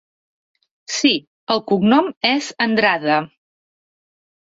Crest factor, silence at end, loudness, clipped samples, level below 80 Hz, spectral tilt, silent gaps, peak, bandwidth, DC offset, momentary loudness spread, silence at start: 18 dB; 1.25 s; -18 LUFS; under 0.1%; -62 dBFS; -4 dB/octave; 1.27-1.47 s, 2.17-2.21 s; -2 dBFS; 8 kHz; under 0.1%; 7 LU; 0.9 s